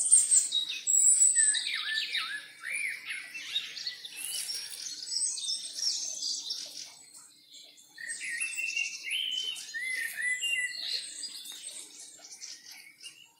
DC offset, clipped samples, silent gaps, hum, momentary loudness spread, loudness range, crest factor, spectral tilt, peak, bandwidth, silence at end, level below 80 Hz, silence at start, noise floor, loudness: under 0.1%; under 0.1%; none; none; 22 LU; 9 LU; 24 dB; 5 dB/octave; -8 dBFS; 16 kHz; 0.2 s; under -90 dBFS; 0 s; -54 dBFS; -28 LUFS